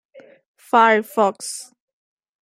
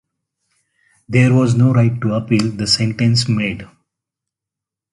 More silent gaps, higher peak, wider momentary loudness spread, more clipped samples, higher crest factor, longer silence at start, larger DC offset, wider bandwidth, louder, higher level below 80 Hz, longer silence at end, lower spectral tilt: first, 0.46-0.54 s vs none; about the same, -2 dBFS vs 0 dBFS; first, 16 LU vs 7 LU; neither; about the same, 20 dB vs 16 dB; second, 0.15 s vs 1.1 s; neither; first, 16 kHz vs 11.5 kHz; second, -18 LUFS vs -15 LUFS; second, -80 dBFS vs -48 dBFS; second, 0.8 s vs 1.3 s; second, -3 dB/octave vs -6 dB/octave